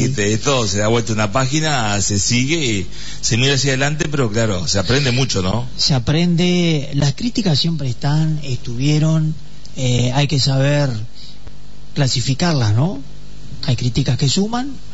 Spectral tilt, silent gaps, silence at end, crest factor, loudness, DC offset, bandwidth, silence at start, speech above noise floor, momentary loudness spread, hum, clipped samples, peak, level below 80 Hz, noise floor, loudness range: -4.5 dB/octave; none; 0 s; 12 dB; -17 LUFS; 6%; 8 kHz; 0 s; 21 dB; 8 LU; none; under 0.1%; -4 dBFS; -38 dBFS; -38 dBFS; 2 LU